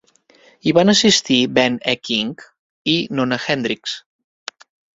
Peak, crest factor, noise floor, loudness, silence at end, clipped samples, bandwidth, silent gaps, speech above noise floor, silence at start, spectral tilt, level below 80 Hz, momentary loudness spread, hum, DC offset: 0 dBFS; 18 dB; -52 dBFS; -17 LUFS; 0.95 s; under 0.1%; 7.8 kHz; 2.59-2.85 s; 35 dB; 0.65 s; -3.5 dB/octave; -58 dBFS; 22 LU; none; under 0.1%